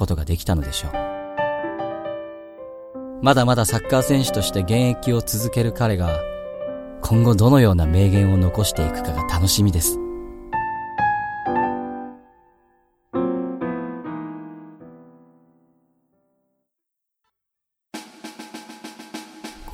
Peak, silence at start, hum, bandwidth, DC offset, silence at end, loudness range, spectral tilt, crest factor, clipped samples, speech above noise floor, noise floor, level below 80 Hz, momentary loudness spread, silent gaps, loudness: 0 dBFS; 0 s; none; 16.5 kHz; under 0.1%; 0 s; 16 LU; -5.5 dB/octave; 20 dB; under 0.1%; 64 dB; -82 dBFS; -36 dBFS; 21 LU; none; -21 LUFS